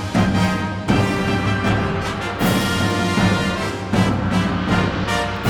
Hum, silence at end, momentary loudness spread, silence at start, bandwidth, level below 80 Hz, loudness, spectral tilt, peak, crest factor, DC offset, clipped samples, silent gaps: none; 0 s; 4 LU; 0 s; over 20 kHz; -34 dBFS; -19 LUFS; -5.5 dB/octave; -4 dBFS; 14 dB; under 0.1%; under 0.1%; none